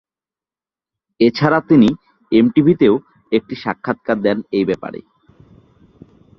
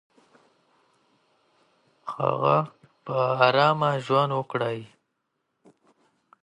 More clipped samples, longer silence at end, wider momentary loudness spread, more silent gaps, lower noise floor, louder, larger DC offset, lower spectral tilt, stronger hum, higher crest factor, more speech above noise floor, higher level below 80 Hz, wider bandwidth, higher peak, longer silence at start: neither; second, 1.4 s vs 1.55 s; second, 12 LU vs 17 LU; neither; first, under -90 dBFS vs -78 dBFS; first, -16 LUFS vs -24 LUFS; neither; first, -8.5 dB/octave vs -6.5 dB/octave; neither; second, 16 dB vs 24 dB; first, over 75 dB vs 54 dB; first, -52 dBFS vs -74 dBFS; second, 7 kHz vs 11 kHz; first, 0 dBFS vs -4 dBFS; second, 1.2 s vs 2.05 s